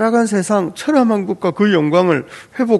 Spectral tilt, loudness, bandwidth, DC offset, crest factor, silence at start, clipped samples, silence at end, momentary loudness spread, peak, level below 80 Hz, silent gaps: -6 dB/octave; -16 LUFS; 12 kHz; under 0.1%; 14 dB; 0 s; under 0.1%; 0 s; 7 LU; 0 dBFS; -60 dBFS; none